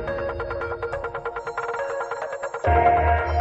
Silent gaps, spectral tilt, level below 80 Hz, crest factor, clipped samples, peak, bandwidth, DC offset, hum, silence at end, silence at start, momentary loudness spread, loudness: none; -7 dB/octave; -36 dBFS; 18 dB; under 0.1%; -6 dBFS; 7.8 kHz; under 0.1%; none; 0 s; 0 s; 12 LU; -24 LUFS